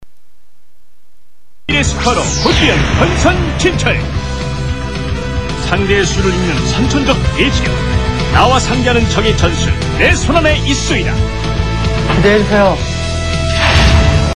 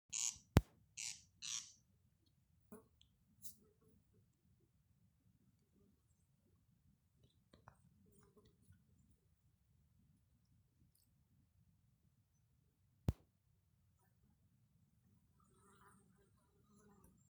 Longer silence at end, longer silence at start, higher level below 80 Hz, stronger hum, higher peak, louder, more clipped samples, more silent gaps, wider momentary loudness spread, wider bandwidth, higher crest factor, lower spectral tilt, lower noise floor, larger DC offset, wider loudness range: second, 0 s vs 4.15 s; about the same, 0 s vs 0.1 s; first, -20 dBFS vs -62 dBFS; neither; first, 0 dBFS vs -12 dBFS; first, -12 LUFS vs -44 LUFS; neither; neither; second, 9 LU vs 25 LU; second, 10.5 kHz vs over 20 kHz; second, 12 dB vs 40 dB; about the same, -5 dB/octave vs -4 dB/octave; second, -58 dBFS vs -79 dBFS; first, 3% vs under 0.1%; second, 3 LU vs 17 LU